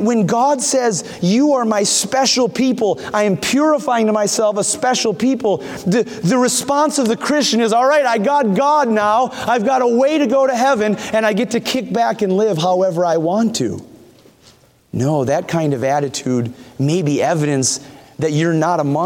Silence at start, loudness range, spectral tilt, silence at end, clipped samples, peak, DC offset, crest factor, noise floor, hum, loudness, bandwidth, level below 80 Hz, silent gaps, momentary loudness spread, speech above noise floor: 0 s; 4 LU; -4.5 dB/octave; 0 s; under 0.1%; -2 dBFS; under 0.1%; 14 dB; -49 dBFS; none; -16 LUFS; 18 kHz; -58 dBFS; none; 5 LU; 34 dB